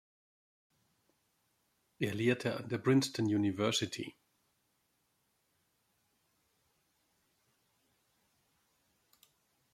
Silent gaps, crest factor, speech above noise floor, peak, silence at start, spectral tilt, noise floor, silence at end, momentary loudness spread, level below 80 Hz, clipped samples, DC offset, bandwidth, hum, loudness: none; 22 dB; 46 dB; -18 dBFS; 2 s; -5 dB/octave; -78 dBFS; 5.65 s; 10 LU; -76 dBFS; under 0.1%; under 0.1%; 15.5 kHz; none; -33 LUFS